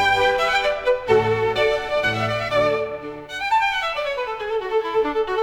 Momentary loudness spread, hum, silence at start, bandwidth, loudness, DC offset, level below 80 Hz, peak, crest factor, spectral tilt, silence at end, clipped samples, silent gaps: 8 LU; none; 0 s; 16.5 kHz; -21 LUFS; under 0.1%; -48 dBFS; -4 dBFS; 16 dB; -4.5 dB/octave; 0 s; under 0.1%; none